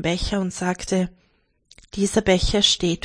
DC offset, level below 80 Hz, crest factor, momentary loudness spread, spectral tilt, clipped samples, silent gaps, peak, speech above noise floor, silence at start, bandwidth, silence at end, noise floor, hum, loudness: under 0.1%; -34 dBFS; 20 dB; 9 LU; -4 dB/octave; under 0.1%; none; -4 dBFS; 37 dB; 0 s; 10.5 kHz; 0.05 s; -58 dBFS; none; -21 LUFS